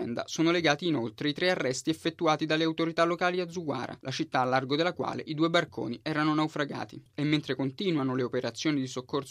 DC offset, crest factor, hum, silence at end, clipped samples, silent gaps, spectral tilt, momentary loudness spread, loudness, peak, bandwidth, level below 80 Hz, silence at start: under 0.1%; 20 dB; none; 0 s; under 0.1%; none; -5 dB/octave; 8 LU; -29 LUFS; -10 dBFS; 13 kHz; -72 dBFS; 0 s